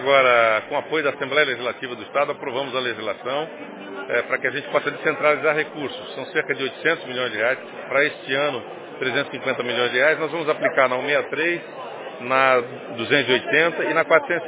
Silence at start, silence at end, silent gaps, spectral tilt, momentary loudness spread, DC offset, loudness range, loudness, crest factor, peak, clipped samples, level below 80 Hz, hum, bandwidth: 0 s; 0 s; none; -7.5 dB/octave; 12 LU; under 0.1%; 4 LU; -21 LUFS; 20 dB; -2 dBFS; under 0.1%; -72 dBFS; none; 4 kHz